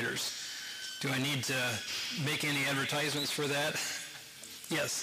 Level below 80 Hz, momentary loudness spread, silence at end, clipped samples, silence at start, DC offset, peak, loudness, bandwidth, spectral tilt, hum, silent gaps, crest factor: -74 dBFS; 9 LU; 0 s; under 0.1%; 0 s; under 0.1%; -24 dBFS; -33 LUFS; 15.5 kHz; -2.5 dB/octave; none; none; 12 dB